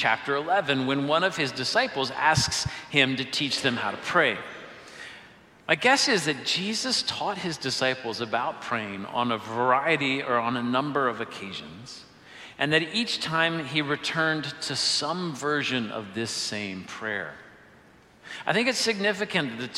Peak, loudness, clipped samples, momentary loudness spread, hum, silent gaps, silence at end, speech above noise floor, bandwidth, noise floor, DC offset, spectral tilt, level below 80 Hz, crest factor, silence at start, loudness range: -4 dBFS; -25 LUFS; under 0.1%; 13 LU; none; none; 0 s; 28 dB; 15.5 kHz; -55 dBFS; under 0.1%; -3 dB/octave; -60 dBFS; 24 dB; 0 s; 4 LU